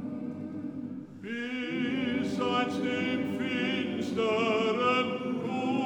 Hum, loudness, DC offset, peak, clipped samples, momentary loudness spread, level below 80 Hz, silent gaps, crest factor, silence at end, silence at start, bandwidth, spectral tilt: none; -30 LUFS; under 0.1%; -16 dBFS; under 0.1%; 11 LU; -74 dBFS; none; 14 dB; 0 s; 0 s; 10.5 kHz; -5.5 dB/octave